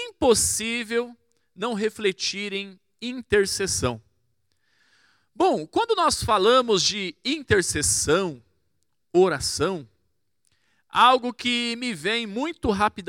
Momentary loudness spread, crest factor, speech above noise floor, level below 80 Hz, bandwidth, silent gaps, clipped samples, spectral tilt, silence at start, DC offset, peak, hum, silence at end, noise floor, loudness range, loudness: 12 LU; 20 dB; 53 dB; -50 dBFS; 17.5 kHz; none; under 0.1%; -3 dB/octave; 0 s; under 0.1%; -4 dBFS; none; 0.05 s; -76 dBFS; 5 LU; -23 LUFS